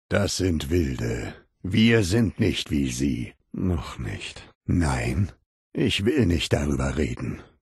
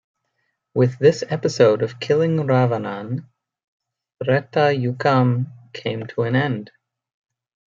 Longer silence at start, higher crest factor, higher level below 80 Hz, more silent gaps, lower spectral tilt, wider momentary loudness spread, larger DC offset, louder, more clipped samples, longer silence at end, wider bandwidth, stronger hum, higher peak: second, 0.1 s vs 0.75 s; about the same, 18 dB vs 18 dB; first, -38 dBFS vs -64 dBFS; first, 4.55-4.61 s, 5.46-5.72 s vs 3.64-3.80 s; second, -5.5 dB/octave vs -7 dB/octave; about the same, 13 LU vs 12 LU; neither; second, -25 LUFS vs -20 LUFS; neither; second, 0.2 s vs 1 s; first, 12.5 kHz vs 7.6 kHz; neither; second, -6 dBFS vs -2 dBFS